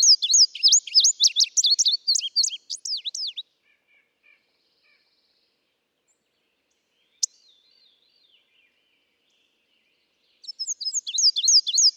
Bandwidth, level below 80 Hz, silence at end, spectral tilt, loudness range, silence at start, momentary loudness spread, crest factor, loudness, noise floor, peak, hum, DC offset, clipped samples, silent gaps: over 20 kHz; under -90 dBFS; 0.05 s; 9 dB/octave; 19 LU; 0 s; 16 LU; 18 dB; -18 LUFS; -74 dBFS; -8 dBFS; none; under 0.1%; under 0.1%; none